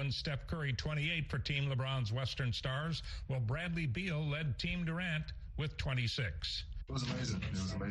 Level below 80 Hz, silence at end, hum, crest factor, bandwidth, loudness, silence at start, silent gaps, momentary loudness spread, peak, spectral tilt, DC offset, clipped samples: -50 dBFS; 0 s; none; 16 dB; 11 kHz; -38 LUFS; 0 s; none; 5 LU; -22 dBFS; -5.5 dB/octave; under 0.1%; under 0.1%